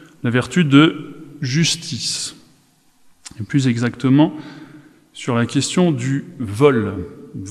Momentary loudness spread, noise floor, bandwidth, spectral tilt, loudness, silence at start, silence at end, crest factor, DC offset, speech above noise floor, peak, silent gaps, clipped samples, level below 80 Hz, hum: 19 LU; -55 dBFS; 13.5 kHz; -5.5 dB/octave; -18 LUFS; 0.25 s; 0 s; 18 dB; under 0.1%; 38 dB; 0 dBFS; none; under 0.1%; -56 dBFS; none